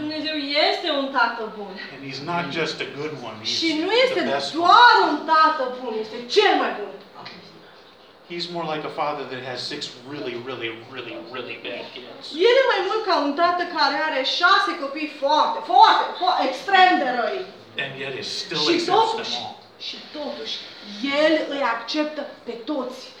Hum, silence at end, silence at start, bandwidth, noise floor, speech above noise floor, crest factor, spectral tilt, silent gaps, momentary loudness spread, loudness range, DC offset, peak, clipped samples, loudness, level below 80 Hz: none; 0 s; 0 s; 11.5 kHz; -49 dBFS; 27 dB; 22 dB; -3.5 dB/octave; none; 17 LU; 12 LU; under 0.1%; -2 dBFS; under 0.1%; -21 LUFS; -72 dBFS